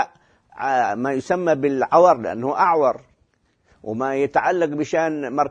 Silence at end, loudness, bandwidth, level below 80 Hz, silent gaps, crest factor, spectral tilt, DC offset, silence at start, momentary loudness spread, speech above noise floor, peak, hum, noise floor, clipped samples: 0 s; -20 LUFS; 9.4 kHz; -62 dBFS; none; 20 dB; -6 dB/octave; under 0.1%; 0 s; 12 LU; 45 dB; -2 dBFS; none; -64 dBFS; under 0.1%